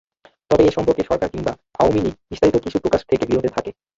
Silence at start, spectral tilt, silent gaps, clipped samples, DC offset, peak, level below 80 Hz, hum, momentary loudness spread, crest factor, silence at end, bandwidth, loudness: 0.5 s; -7 dB/octave; none; under 0.1%; under 0.1%; -2 dBFS; -42 dBFS; none; 9 LU; 16 dB; 0.25 s; 7.8 kHz; -19 LUFS